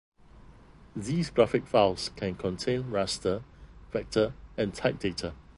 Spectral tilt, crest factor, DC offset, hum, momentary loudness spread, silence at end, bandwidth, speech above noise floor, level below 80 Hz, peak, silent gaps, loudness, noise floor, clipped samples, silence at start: -5.5 dB/octave; 22 dB; under 0.1%; none; 11 LU; 0.15 s; 11.5 kHz; 24 dB; -52 dBFS; -8 dBFS; none; -29 LUFS; -53 dBFS; under 0.1%; 0.35 s